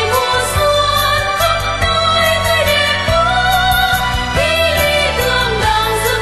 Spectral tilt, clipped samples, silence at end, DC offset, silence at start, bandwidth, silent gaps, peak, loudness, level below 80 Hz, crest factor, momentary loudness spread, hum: -3 dB/octave; under 0.1%; 0 s; under 0.1%; 0 s; 13 kHz; none; -2 dBFS; -13 LUFS; -26 dBFS; 12 dB; 3 LU; none